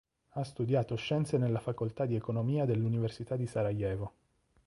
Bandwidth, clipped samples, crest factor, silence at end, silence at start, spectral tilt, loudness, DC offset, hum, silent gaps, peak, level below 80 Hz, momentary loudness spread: 11.5 kHz; under 0.1%; 16 dB; 0.6 s; 0.35 s; -8 dB/octave; -33 LUFS; under 0.1%; none; none; -18 dBFS; -58 dBFS; 9 LU